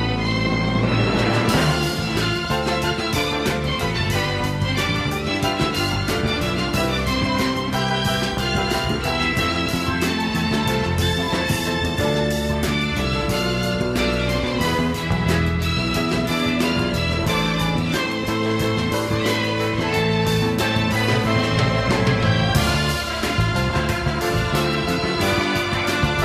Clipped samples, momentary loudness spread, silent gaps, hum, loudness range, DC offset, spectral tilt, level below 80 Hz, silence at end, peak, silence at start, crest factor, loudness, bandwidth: under 0.1%; 3 LU; none; none; 2 LU; under 0.1%; -5 dB/octave; -34 dBFS; 0 s; -6 dBFS; 0 s; 16 dB; -20 LUFS; 16 kHz